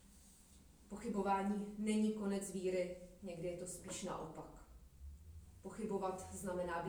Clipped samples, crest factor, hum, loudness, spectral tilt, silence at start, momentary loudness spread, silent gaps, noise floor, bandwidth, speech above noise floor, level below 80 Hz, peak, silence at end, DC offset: under 0.1%; 18 dB; none; -42 LUFS; -5.5 dB/octave; 0 s; 22 LU; none; -64 dBFS; over 20 kHz; 22 dB; -62 dBFS; -24 dBFS; 0 s; under 0.1%